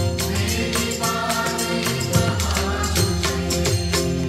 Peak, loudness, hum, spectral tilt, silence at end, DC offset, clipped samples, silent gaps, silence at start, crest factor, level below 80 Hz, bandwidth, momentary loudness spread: -6 dBFS; -21 LUFS; none; -4 dB/octave; 0 s; under 0.1%; under 0.1%; none; 0 s; 16 dB; -32 dBFS; 16 kHz; 2 LU